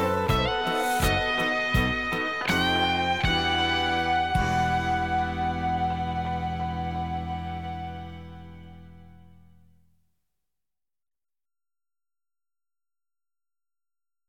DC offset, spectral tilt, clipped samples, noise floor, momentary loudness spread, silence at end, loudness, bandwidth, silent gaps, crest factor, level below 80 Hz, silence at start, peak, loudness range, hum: under 0.1%; -4.5 dB/octave; under 0.1%; under -90 dBFS; 12 LU; 5.2 s; -26 LUFS; 18 kHz; none; 18 dB; -40 dBFS; 0 s; -10 dBFS; 14 LU; none